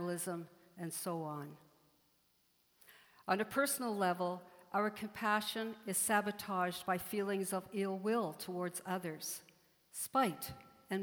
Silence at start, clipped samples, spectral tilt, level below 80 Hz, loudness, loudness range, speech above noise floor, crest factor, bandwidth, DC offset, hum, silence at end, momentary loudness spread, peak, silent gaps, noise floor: 0 s; under 0.1%; -3.5 dB/octave; -76 dBFS; -38 LUFS; 5 LU; 37 dB; 22 dB; over 20 kHz; under 0.1%; none; 0 s; 13 LU; -18 dBFS; none; -75 dBFS